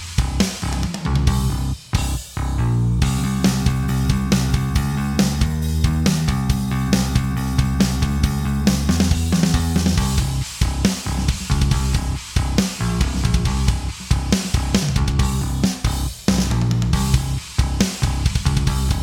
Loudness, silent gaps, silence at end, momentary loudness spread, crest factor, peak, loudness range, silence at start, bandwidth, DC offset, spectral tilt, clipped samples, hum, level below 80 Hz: -20 LUFS; none; 0 s; 4 LU; 18 dB; 0 dBFS; 2 LU; 0 s; 18 kHz; under 0.1%; -5 dB/octave; under 0.1%; none; -24 dBFS